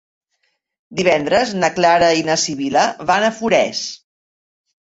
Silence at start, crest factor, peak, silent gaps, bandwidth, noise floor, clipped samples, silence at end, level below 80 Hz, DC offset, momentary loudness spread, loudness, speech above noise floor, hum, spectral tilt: 0.9 s; 16 dB; -2 dBFS; none; 8 kHz; -69 dBFS; under 0.1%; 0.9 s; -54 dBFS; under 0.1%; 7 LU; -16 LUFS; 53 dB; none; -3.5 dB/octave